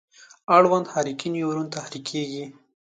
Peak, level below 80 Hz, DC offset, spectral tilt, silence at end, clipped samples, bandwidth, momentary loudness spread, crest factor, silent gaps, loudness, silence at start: -2 dBFS; -74 dBFS; under 0.1%; -5 dB/octave; 0.45 s; under 0.1%; 9.4 kHz; 18 LU; 22 dB; none; -23 LUFS; 0.5 s